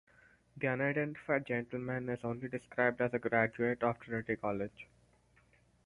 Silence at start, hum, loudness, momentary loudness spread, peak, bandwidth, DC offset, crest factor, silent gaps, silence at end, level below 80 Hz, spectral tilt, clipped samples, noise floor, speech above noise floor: 0.55 s; none; -35 LUFS; 9 LU; -16 dBFS; 11 kHz; under 0.1%; 22 dB; none; 1 s; -68 dBFS; -8.5 dB/octave; under 0.1%; -68 dBFS; 33 dB